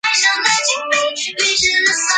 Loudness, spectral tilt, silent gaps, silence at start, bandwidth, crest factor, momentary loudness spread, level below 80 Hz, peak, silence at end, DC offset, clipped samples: -14 LUFS; 1.5 dB/octave; none; 0.05 s; 10 kHz; 16 dB; 4 LU; -52 dBFS; 0 dBFS; 0 s; under 0.1%; under 0.1%